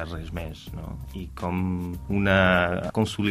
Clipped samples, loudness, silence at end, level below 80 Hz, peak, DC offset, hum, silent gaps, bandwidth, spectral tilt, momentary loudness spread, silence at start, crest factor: under 0.1%; -25 LUFS; 0 s; -42 dBFS; -6 dBFS; under 0.1%; none; none; 15.5 kHz; -6.5 dB/octave; 17 LU; 0 s; 20 dB